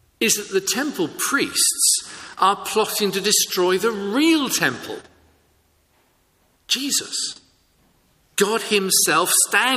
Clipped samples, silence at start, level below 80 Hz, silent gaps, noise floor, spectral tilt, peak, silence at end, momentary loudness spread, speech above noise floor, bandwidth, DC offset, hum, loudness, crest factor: under 0.1%; 0.2 s; -64 dBFS; none; -62 dBFS; -1.5 dB/octave; -2 dBFS; 0 s; 10 LU; 42 dB; 15.5 kHz; under 0.1%; none; -19 LUFS; 20 dB